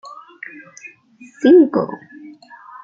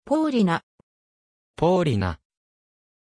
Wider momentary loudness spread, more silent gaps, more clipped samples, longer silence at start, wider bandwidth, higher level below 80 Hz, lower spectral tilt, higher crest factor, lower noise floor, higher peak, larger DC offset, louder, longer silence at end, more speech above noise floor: first, 27 LU vs 9 LU; second, none vs 0.63-1.54 s; neither; first, 0.85 s vs 0.05 s; second, 7.4 kHz vs 10.5 kHz; second, -68 dBFS vs -50 dBFS; about the same, -6.5 dB/octave vs -7.5 dB/octave; about the same, 16 dB vs 18 dB; second, -41 dBFS vs under -90 dBFS; first, -2 dBFS vs -8 dBFS; neither; first, -14 LUFS vs -23 LUFS; about the same, 0.9 s vs 0.9 s; second, 24 dB vs over 69 dB